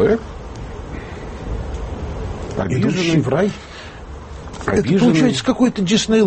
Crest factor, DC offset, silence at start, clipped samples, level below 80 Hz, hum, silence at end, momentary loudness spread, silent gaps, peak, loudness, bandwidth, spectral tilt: 16 dB; under 0.1%; 0 s; under 0.1%; -34 dBFS; none; 0 s; 19 LU; none; -4 dBFS; -18 LUFS; 8.8 kHz; -5.5 dB/octave